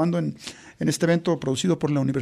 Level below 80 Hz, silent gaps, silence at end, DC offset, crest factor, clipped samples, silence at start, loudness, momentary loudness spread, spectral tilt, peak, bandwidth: -58 dBFS; none; 0 s; under 0.1%; 14 dB; under 0.1%; 0 s; -24 LUFS; 11 LU; -6 dB/octave; -8 dBFS; 13 kHz